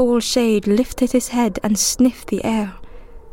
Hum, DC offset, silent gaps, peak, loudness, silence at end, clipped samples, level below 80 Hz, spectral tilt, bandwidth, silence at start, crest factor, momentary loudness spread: none; under 0.1%; none; -4 dBFS; -18 LUFS; 0 s; under 0.1%; -40 dBFS; -4 dB/octave; 17 kHz; 0 s; 14 dB; 6 LU